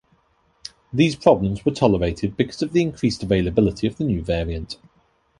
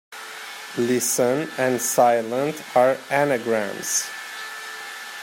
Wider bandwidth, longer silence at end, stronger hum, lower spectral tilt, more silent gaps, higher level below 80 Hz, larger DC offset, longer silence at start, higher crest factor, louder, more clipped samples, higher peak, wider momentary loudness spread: second, 11.5 kHz vs 16.5 kHz; first, 0.65 s vs 0 s; neither; first, -7 dB/octave vs -3 dB/octave; neither; first, -38 dBFS vs -74 dBFS; neither; first, 0.95 s vs 0.1 s; about the same, 20 dB vs 18 dB; about the same, -21 LUFS vs -22 LUFS; neither; first, 0 dBFS vs -6 dBFS; about the same, 16 LU vs 15 LU